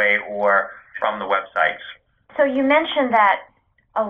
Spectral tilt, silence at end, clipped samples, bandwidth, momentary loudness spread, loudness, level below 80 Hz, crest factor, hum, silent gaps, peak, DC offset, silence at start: -6 dB/octave; 0 s; under 0.1%; 5.2 kHz; 14 LU; -19 LUFS; -62 dBFS; 16 dB; none; none; -4 dBFS; under 0.1%; 0 s